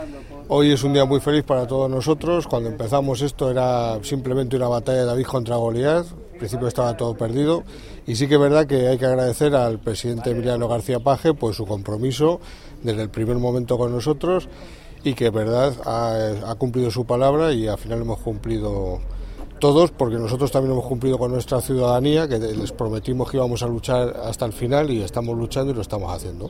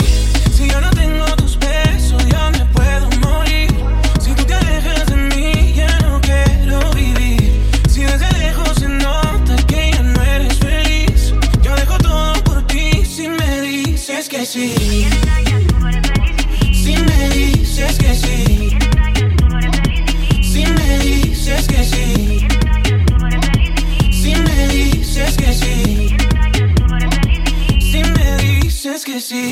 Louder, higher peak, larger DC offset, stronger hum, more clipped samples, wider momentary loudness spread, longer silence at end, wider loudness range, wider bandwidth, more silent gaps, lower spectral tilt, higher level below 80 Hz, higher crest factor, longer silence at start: second, -21 LUFS vs -15 LUFS; about the same, -2 dBFS vs 0 dBFS; neither; neither; neither; first, 9 LU vs 3 LU; about the same, 0 s vs 0 s; about the same, 3 LU vs 1 LU; about the same, 16.5 kHz vs 15.5 kHz; neither; first, -6.5 dB/octave vs -5 dB/octave; second, -38 dBFS vs -14 dBFS; first, 18 dB vs 12 dB; about the same, 0 s vs 0 s